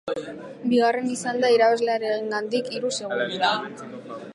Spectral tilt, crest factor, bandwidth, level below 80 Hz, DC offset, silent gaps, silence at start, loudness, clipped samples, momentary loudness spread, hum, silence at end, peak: -3.5 dB/octave; 16 dB; 11.5 kHz; -74 dBFS; under 0.1%; none; 0.05 s; -23 LUFS; under 0.1%; 17 LU; none; 0 s; -8 dBFS